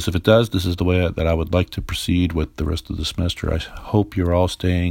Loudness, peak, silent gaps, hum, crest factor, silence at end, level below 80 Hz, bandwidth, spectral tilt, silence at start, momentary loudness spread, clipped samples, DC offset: -21 LUFS; 0 dBFS; none; none; 20 dB; 0 s; -34 dBFS; 16.5 kHz; -6.5 dB/octave; 0 s; 9 LU; under 0.1%; under 0.1%